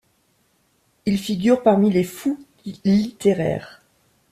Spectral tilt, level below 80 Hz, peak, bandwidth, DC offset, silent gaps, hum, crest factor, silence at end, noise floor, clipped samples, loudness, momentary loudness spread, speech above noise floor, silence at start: -7 dB/octave; -56 dBFS; -4 dBFS; 14.5 kHz; under 0.1%; none; none; 18 dB; 0.6 s; -64 dBFS; under 0.1%; -20 LUFS; 13 LU; 45 dB; 1.05 s